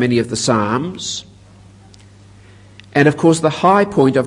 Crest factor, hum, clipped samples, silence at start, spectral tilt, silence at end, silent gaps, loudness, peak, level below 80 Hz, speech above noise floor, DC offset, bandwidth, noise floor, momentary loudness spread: 16 dB; 50 Hz at -45 dBFS; under 0.1%; 0 s; -5 dB/octave; 0 s; none; -15 LUFS; 0 dBFS; -52 dBFS; 28 dB; under 0.1%; 11 kHz; -43 dBFS; 11 LU